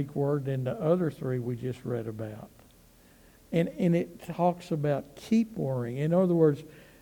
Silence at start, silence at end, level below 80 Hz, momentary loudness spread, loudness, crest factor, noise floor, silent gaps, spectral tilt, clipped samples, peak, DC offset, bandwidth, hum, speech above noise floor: 0 s; 0.2 s; -62 dBFS; 11 LU; -29 LUFS; 18 dB; -58 dBFS; none; -8.5 dB/octave; under 0.1%; -12 dBFS; under 0.1%; 19 kHz; none; 29 dB